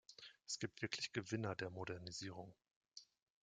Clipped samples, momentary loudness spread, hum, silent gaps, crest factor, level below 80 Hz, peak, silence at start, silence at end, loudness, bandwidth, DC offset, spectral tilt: under 0.1%; 17 LU; none; 2.76-2.81 s; 24 dB; -80 dBFS; -24 dBFS; 0.1 s; 0.4 s; -47 LUFS; 9.6 kHz; under 0.1%; -4 dB/octave